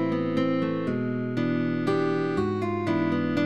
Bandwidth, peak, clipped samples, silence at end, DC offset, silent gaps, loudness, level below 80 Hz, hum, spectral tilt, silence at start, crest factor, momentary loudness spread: 8.8 kHz; -12 dBFS; under 0.1%; 0 s; 0.4%; none; -26 LUFS; -60 dBFS; none; -8 dB/octave; 0 s; 12 dB; 3 LU